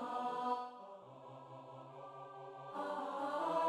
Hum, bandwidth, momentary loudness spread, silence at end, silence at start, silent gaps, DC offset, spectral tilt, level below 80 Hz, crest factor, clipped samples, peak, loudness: none; 13 kHz; 15 LU; 0 s; 0 s; none; under 0.1%; -5.5 dB/octave; -88 dBFS; 18 dB; under 0.1%; -24 dBFS; -44 LUFS